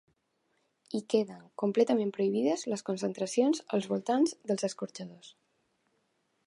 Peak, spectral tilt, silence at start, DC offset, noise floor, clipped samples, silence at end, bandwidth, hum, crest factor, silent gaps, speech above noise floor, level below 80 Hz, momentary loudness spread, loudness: -14 dBFS; -5.5 dB/octave; 0.9 s; under 0.1%; -76 dBFS; under 0.1%; 1.15 s; 11.5 kHz; none; 18 dB; none; 46 dB; -86 dBFS; 11 LU; -31 LUFS